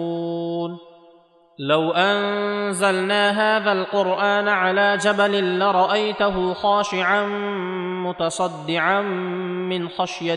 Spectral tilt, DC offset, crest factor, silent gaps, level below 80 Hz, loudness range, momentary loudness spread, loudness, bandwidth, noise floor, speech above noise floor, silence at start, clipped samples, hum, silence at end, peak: -4.5 dB/octave; under 0.1%; 16 dB; none; -58 dBFS; 4 LU; 8 LU; -20 LUFS; 12 kHz; -53 dBFS; 33 dB; 0 s; under 0.1%; none; 0 s; -4 dBFS